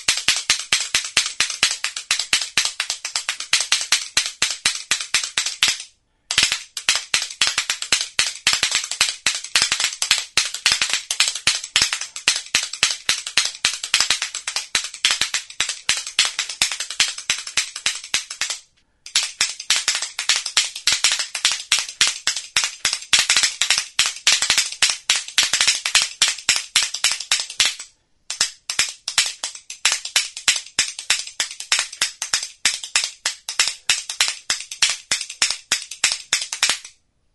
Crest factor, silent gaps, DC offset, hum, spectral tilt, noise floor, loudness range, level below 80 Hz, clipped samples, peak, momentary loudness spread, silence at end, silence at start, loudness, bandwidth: 22 dB; none; under 0.1%; none; 2.5 dB/octave; -48 dBFS; 4 LU; -56 dBFS; under 0.1%; 0 dBFS; 6 LU; 0.45 s; 0 s; -19 LUFS; over 20 kHz